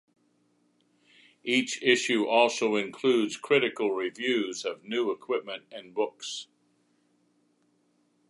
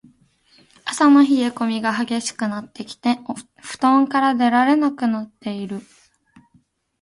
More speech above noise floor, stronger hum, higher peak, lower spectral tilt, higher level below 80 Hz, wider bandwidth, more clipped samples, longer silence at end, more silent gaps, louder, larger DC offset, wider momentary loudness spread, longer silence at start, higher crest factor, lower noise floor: about the same, 42 dB vs 42 dB; neither; second, -8 dBFS vs -2 dBFS; about the same, -3 dB/octave vs -4 dB/octave; second, -84 dBFS vs -66 dBFS; about the same, 11.5 kHz vs 11.5 kHz; neither; first, 1.85 s vs 1.2 s; neither; second, -27 LUFS vs -19 LUFS; neither; second, 14 LU vs 17 LU; first, 1.45 s vs 0.85 s; about the same, 22 dB vs 18 dB; first, -70 dBFS vs -60 dBFS